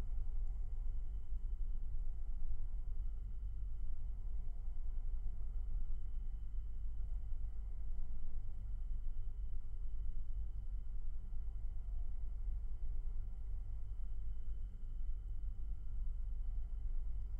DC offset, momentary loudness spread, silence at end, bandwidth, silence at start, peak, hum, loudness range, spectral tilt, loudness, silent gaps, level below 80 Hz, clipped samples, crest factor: under 0.1%; 3 LU; 0 s; 1.4 kHz; 0 s; -28 dBFS; none; 1 LU; -9 dB/octave; -49 LUFS; none; -40 dBFS; under 0.1%; 10 dB